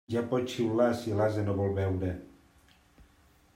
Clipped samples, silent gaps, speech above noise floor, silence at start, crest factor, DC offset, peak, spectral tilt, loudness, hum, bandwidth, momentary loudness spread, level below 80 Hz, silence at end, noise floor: under 0.1%; none; 33 dB; 0.1 s; 18 dB; under 0.1%; -12 dBFS; -7.5 dB/octave; -30 LUFS; none; 15.5 kHz; 7 LU; -62 dBFS; 0.55 s; -62 dBFS